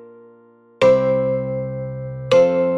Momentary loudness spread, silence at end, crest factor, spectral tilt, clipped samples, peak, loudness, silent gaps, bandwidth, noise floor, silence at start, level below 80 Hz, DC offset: 14 LU; 0 s; 16 dB; -7 dB/octave; under 0.1%; -4 dBFS; -18 LUFS; none; 8 kHz; -50 dBFS; 0 s; -52 dBFS; under 0.1%